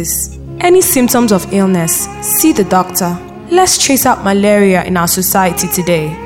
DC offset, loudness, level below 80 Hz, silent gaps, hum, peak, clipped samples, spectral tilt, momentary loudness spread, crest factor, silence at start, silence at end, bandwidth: under 0.1%; -11 LUFS; -36 dBFS; none; none; 0 dBFS; under 0.1%; -4 dB/octave; 7 LU; 10 dB; 0 s; 0 s; 17 kHz